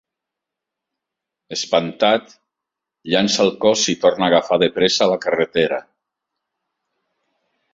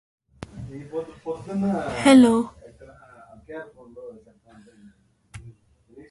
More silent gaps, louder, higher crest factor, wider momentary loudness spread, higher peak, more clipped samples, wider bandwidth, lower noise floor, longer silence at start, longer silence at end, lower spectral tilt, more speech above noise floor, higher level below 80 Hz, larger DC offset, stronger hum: neither; first, -17 LUFS vs -21 LUFS; about the same, 20 dB vs 22 dB; second, 6 LU vs 29 LU; about the same, -2 dBFS vs -4 dBFS; neither; second, 8 kHz vs 11.5 kHz; first, -84 dBFS vs -55 dBFS; first, 1.5 s vs 0.55 s; first, 1.95 s vs 0.1 s; second, -3.5 dB/octave vs -5.5 dB/octave; first, 66 dB vs 36 dB; second, -60 dBFS vs -54 dBFS; neither; neither